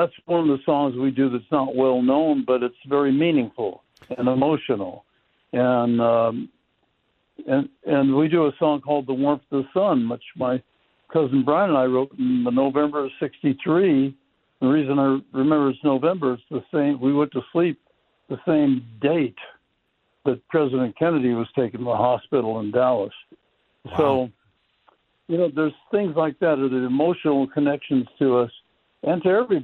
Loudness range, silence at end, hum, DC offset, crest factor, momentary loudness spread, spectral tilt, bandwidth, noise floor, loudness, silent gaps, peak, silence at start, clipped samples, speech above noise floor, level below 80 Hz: 3 LU; 0 s; none; under 0.1%; 18 dB; 8 LU; -10 dB/octave; 4.2 kHz; -70 dBFS; -22 LUFS; none; -4 dBFS; 0 s; under 0.1%; 49 dB; -64 dBFS